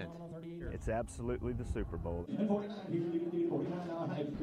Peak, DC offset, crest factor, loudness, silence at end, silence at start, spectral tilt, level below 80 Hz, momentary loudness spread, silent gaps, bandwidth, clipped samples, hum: -22 dBFS; under 0.1%; 16 dB; -38 LUFS; 0 s; 0 s; -8 dB/octave; -48 dBFS; 9 LU; none; 11.5 kHz; under 0.1%; none